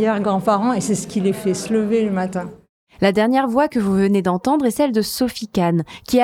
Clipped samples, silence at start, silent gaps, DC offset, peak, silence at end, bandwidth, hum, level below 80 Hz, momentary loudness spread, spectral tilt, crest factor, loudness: under 0.1%; 0 s; 2.69-2.87 s; under 0.1%; -2 dBFS; 0 s; 16.5 kHz; none; -52 dBFS; 5 LU; -6 dB/octave; 16 dB; -19 LUFS